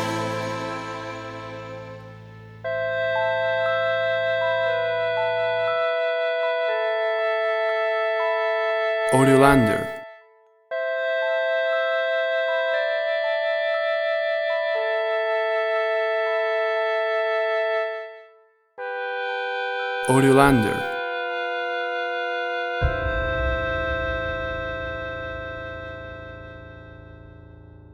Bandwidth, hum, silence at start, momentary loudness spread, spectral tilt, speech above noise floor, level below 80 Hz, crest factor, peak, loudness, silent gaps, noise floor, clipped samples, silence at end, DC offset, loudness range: 13.5 kHz; none; 0 s; 14 LU; -5.5 dB/octave; 40 dB; -42 dBFS; 22 dB; 0 dBFS; -23 LUFS; none; -56 dBFS; under 0.1%; 0 s; under 0.1%; 6 LU